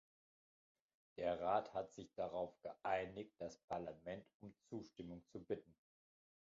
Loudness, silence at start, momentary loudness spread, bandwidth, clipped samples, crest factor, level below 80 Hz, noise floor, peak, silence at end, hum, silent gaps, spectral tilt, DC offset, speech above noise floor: -47 LUFS; 1.15 s; 14 LU; 7.4 kHz; under 0.1%; 22 dB; -76 dBFS; under -90 dBFS; -26 dBFS; 0.8 s; none; 3.64-3.68 s, 4.34-4.40 s; -4.5 dB/octave; under 0.1%; over 43 dB